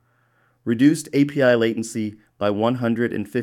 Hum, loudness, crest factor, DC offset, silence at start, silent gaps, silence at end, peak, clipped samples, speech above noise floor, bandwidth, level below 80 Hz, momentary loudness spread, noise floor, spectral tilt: none; -21 LUFS; 16 dB; under 0.1%; 0.65 s; none; 0 s; -4 dBFS; under 0.1%; 43 dB; 14 kHz; -64 dBFS; 11 LU; -63 dBFS; -6 dB/octave